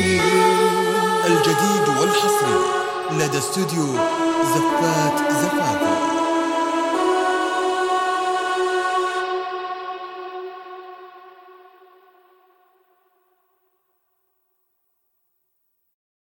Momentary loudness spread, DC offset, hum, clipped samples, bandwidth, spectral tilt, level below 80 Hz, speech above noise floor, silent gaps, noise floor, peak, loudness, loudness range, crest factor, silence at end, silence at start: 15 LU; under 0.1%; none; under 0.1%; 17 kHz; -4 dB/octave; -62 dBFS; 51 dB; none; -71 dBFS; -4 dBFS; -19 LUFS; 14 LU; 18 dB; 4.85 s; 0 s